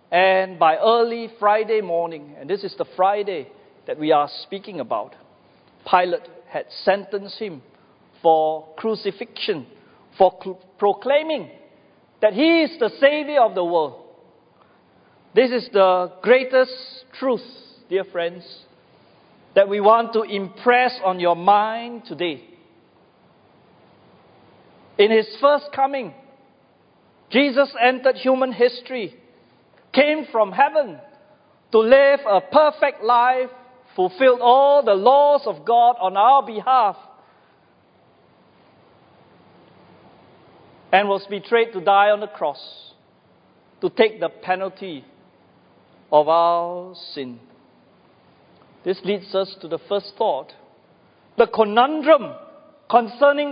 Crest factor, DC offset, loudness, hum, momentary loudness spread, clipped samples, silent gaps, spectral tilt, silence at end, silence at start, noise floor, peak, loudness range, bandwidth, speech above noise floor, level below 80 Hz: 20 dB; under 0.1%; -19 LUFS; none; 16 LU; under 0.1%; none; -9 dB/octave; 0 s; 0.1 s; -57 dBFS; -2 dBFS; 9 LU; 5.2 kHz; 38 dB; -70 dBFS